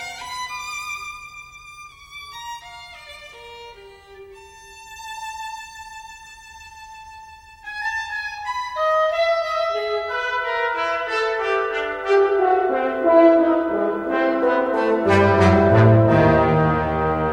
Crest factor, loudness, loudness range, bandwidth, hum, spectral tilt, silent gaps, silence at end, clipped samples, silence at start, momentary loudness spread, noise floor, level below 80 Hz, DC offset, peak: 18 dB; -19 LUFS; 20 LU; 14 kHz; none; -6.5 dB/octave; none; 0 s; under 0.1%; 0 s; 25 LU; -43 dBFS; -44 dBFS; under 0.1%; -2 dBFS